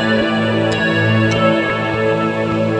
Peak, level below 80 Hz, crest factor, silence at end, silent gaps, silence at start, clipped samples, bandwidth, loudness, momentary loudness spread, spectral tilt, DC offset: -2 dBFS; -44 dBFS; 12 dB; 0 s; none; 0 s; under 0.1%; 10.5 kHz; -15 LUFS; 3 LU; -6.5 dB/octave; under 0.1%